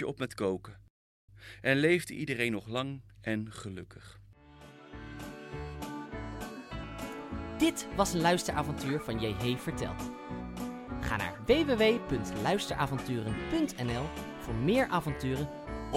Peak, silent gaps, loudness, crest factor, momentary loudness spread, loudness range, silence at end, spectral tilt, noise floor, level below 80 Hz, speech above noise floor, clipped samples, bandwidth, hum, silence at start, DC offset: -12 dBFS; 0.90-1.28 s; -33 LUFS; 20 dB; 16 LU; 11 LU; 0 s; -5 dB/octave; -54 dBFS; -50 dBFS; 23 dB; under 0.1%; 16.5 kHz; none; 0 s; under 0.1%